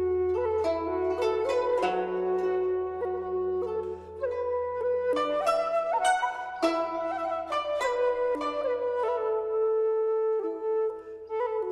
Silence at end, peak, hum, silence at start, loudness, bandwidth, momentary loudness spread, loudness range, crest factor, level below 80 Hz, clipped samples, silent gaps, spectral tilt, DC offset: 0 s; -12 dBFS; none; 0 s; -28 LUFS; 12.5 kHz; 5 LU; 2 LU; 16 dB; -58 dBFS; under 0.1%; none; -4.5 dB/octave; under 0.1%